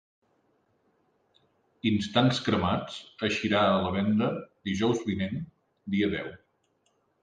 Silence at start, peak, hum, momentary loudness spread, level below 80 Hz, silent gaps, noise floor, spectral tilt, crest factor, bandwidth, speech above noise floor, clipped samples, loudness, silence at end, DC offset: 1.85 s; -10 dBFS; none; 12 LU; -54 dBFS; none; -72 dBFS; -6 dB/octave; 20 dB; 9.2 kHz; 45 dB; under 0.1%; -28 LUFS; 0.85 s; under 0.1%